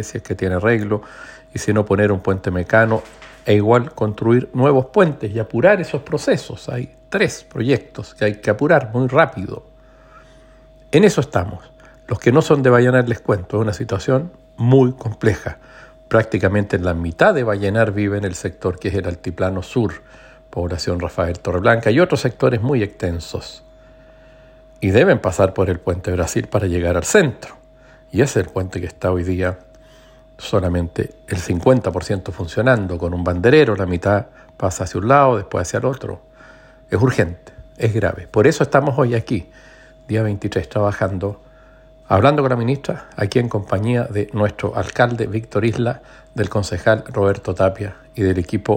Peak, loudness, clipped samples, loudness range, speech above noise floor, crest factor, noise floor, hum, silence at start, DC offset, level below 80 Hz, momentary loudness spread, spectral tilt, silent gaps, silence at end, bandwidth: 0 dBFS; -18 LUFS; under 0.1%; 4 LU; 29 dB; 18 dB; -46 dBFS; none; 0 s; under 0.1%; -46 dBFS; 12 LU; -6.5 dB/octave; none; 0 s; 16.5 kHz